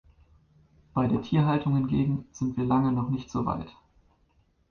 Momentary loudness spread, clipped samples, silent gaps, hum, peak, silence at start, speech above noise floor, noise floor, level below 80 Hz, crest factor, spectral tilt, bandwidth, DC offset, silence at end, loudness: 7 LU; under 0.1%; none; none; -12 dBFS; 0.95 s; 40 dB; -66 dBFS; -52 dBFS; 16 dB; -8.5 dB/octave; 6.8 kHz; under 0.1%; 1 s; -27 LUFS